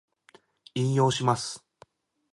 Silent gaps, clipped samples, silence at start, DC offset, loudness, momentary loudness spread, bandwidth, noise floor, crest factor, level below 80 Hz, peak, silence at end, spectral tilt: none; under 0.1%; 0.75 s; under 0.1%; -27 LUFS; 13 LU; 11.5 kHz; -60 dBFS; 20 dB; -68 dBFS; -10 dBFS; 0.75 s; -5.5 dB/octave